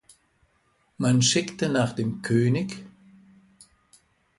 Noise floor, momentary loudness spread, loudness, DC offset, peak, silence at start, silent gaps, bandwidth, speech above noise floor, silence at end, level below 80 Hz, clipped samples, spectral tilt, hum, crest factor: -67 dBFS; 9 LU; -24 LUFS; under 0.1%; -10 dBFS; 1 s; none; 11.5 kHz; 44 dB; 1.5 s; -60 dBFS; under 0.1%; -4.5 dB/octave; none; 18 dB